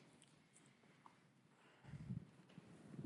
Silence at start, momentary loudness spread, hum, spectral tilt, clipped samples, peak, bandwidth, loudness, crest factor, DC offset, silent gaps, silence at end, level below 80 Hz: 0 s; 16 LU; none; -6.5 dB/octave; under 0.1%; -38 dBFS; 11.5 kHz; -59 LUFS; 20 dB; under 0.1%; none; 0 s; -78 dBFS